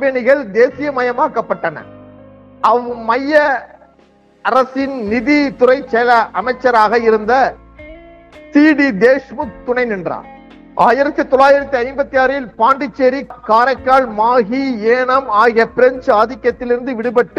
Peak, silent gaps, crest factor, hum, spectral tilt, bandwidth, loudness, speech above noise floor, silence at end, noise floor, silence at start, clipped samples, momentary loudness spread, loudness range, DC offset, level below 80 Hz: 0 dBFS; none; 14 dB; none; -6 dB/octave; 8 kHz; -14 LUFS; 36 dB; 0.1 s; -49 dBFS; 0 s; under 0.1%; 8 LU; 4 LU; under 0.1%; -46 dBFS